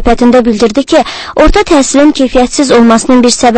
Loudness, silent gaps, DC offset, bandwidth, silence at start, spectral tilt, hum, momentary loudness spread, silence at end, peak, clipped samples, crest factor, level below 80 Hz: -7 LUFS; none; under 0.1%; 11 kHz; 0 s; -4 dB/octave; none; 4 LU; 0 s; 0 dBFS; 3%; 6 dB; -20 dBFS